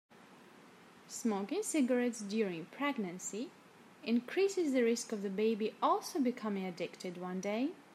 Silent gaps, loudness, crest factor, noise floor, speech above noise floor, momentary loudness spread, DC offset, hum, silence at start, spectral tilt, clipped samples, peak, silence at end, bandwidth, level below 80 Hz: none; -36 LUFS; 18 dB; -59 dBFS; 24 dB; 10 LU; under 0.1%; none; 0.2 s; -4.5 dB/octave; under 0.1%; -18 dBFS; 0 s; 15 kHz; -90 dBFS